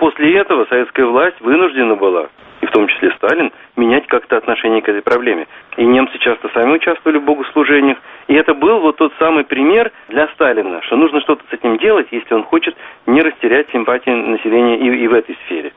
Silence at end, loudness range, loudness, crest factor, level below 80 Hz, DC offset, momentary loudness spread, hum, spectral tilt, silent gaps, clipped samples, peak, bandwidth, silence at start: 0.1 s; 2 LU; -13 LUFS; 14 dB; -54 dBFS; under 0.1%; 6 LU; none; -2 dB/octave; none; under 0.1%; 0 dBFS; 4 kHz; 0 s